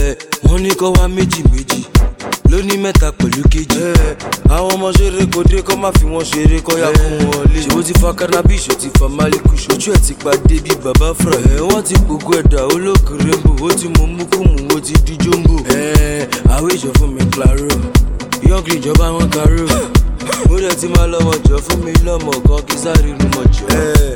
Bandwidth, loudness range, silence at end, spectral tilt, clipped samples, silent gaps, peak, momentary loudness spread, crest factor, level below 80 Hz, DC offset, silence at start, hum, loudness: 17.5 kHz; 1 LU; 0 s; -5.5 dB/octave; 0.1%; none; 0 dBFS; 3 LU; 10 dB; -14 dBFS; 0.5%; 0 s; none; -13 LUFS